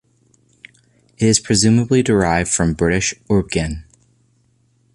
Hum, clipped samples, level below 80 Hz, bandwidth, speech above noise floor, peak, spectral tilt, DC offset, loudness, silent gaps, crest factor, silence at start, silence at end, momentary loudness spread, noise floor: none; under 0.1%; -36 dBFS; 11.5 kHz; 43 dB; 0 dBFS; -4.5 dB/octave; under 0.1%; -16 LUFS; none; 18 dB; 1.2 s; 1.1 s; 8 LU; -59 dBFS